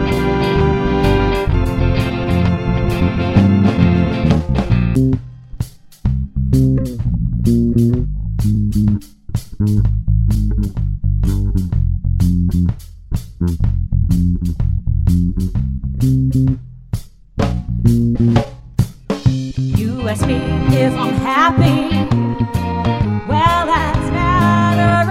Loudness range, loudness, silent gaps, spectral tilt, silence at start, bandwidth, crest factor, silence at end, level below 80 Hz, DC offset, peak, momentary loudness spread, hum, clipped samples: 3 LU; -16 LUFS; none; -7.5 dB/octave; 0 s; 15 kHz; 14 dB; 0 s; -22 dBFS; under 0.1%; 0 dBFS; 8 LU; none; under 0.1%